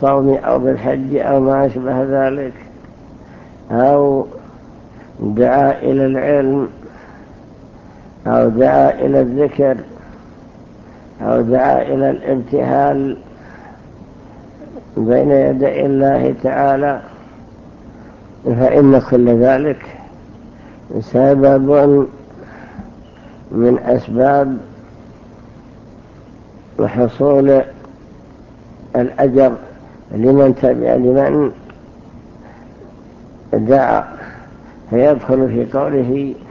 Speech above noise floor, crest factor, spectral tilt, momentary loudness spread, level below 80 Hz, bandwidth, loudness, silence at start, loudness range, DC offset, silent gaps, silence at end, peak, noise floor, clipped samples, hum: 26 dB; 16 dB; -10 dB/octave; 16 LU; -44 dBFS; 6.4 kHz; -14 LUFS; 0 s; 4 LU; under 0.1%; none; 0 s; 0 dBFS; -39 dBFS; under 0.1%; none